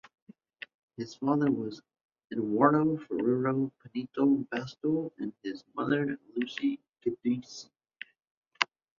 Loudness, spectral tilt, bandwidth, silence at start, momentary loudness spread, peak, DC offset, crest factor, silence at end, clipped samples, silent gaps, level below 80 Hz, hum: -31 LUFS; -6.5 dB/octave; 7.4 kHz; 1 s; 20 LU; -4 dBFS; under 0.1%; 28 dB; 0.35 s; under 0.1%; 2.04-2.09 s, 6.89-6.93 s, 8.31-8.42 s; -72 dBFS; none